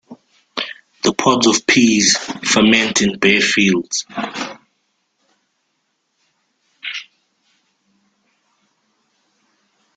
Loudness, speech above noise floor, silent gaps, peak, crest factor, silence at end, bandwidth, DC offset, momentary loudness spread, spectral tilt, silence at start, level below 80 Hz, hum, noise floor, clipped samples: -15 LUFS; 54 dB; none; 0 dBFS; 20 dB; 2.95 s; 9.6 kHz; under 0.1%; 16 LU; -2.5 dB/octave; 0.1 s; -56 dBFS; none; -69 dBFS; under 0.1%